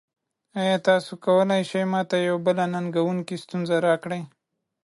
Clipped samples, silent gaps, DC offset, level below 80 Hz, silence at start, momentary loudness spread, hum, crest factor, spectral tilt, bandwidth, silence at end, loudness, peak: under 0.1%; none; under 0.1%; -74 dBFS; 0.55 s; 11 LU; none; 16 dB; -6 dB/octave; 11.5 kHz; 0.6 s; -24 LUFS; -8 dBFS